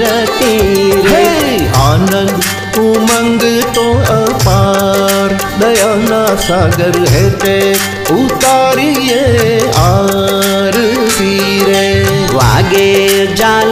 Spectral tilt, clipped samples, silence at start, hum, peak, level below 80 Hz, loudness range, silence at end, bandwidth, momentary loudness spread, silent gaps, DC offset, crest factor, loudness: -4.5 dB/octave; under 0.1%; 0 s; none; 0 dBFS; -28 dBFS; 1 LU; 0 s; 16 kHz; 3 LU; none; under 0.1%; 10 dB; -9 LUFS